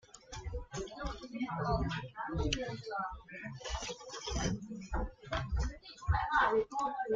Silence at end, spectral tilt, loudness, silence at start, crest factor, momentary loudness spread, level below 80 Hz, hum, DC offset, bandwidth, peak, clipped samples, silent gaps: 0 s; -5 dB/octave; -37 LUFS; 0.15 s; 20 dB; 13 LU; -44 dBFS; none; under 0.1%; 7.8 kHz; -16 dBFS; under 0.1%; none